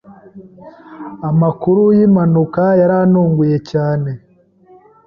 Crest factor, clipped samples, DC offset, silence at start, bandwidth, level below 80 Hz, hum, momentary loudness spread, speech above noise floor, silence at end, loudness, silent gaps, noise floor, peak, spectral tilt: 12 dB; under 0.1%; under 0.1%; 0.1 s; 6.4 kHz; -52 dBFS; none; 14 LU; 34 dB; 0.9 s; -13 LUFS; none; -47 dBFS; -2 dBFS; -10.5 dB/octave